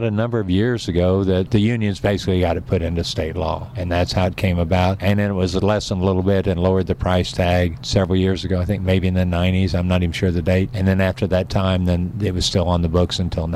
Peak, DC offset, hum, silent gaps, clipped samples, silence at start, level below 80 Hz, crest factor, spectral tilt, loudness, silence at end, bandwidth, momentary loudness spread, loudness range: -6 dBFS; under 0.1%; none; none; under 0.1%; 0 s; -34 dBFS; 12 dB; -6.5 dB/octave; -19 LUFS; 0 s; 13 kHz; 3 LU; 1 LU